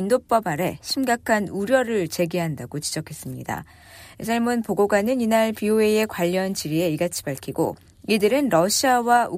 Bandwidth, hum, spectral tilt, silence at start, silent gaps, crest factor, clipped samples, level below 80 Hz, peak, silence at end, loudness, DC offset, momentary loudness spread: 15.5 kHz; none; -4.5 dB/octave; 0 s; none; 16 dB; under 0.1%; -56 dBFS; -6 dBFS; 0 s; -22 LUFS; under 0.1%; 11 LU